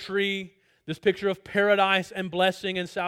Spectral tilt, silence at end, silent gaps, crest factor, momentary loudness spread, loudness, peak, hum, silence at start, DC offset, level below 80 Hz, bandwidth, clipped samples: -5 dB/octave; 0 s; none; 18 dB; 11 LU; -25 LUFS; -8 dBFS; none; 0 s; under 0.1%; -66 dBFS; 15.5 kHz; under 0.1%